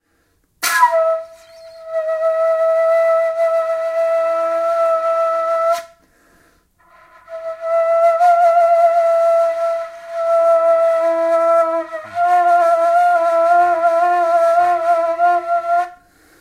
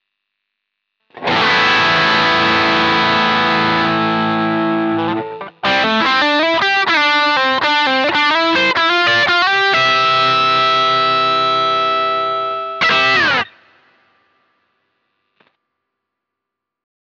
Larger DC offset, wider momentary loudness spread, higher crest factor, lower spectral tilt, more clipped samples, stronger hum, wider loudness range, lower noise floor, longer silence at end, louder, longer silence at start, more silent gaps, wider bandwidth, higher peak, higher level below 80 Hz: neither; first, 9 LU vs 6 LU; about the same, 14 dB vs 12 dB; second, -1.5 dB/octave vs -4 dB/octave; neither; neither; about the same, 5 LU vs 5 LU; second, -62 dBFS vs -81 dBFS; second, 0.45 s vs 3.6 s; about the same, -15 LUFS vs -13 LUFS; second, 0.6 s vs 1.15 s; neither; first, 16 kHz vs 8.4 kHz; about the same, -2 dBFS vs -4 dBFS; second, -64 dBFS vs -54 dBFS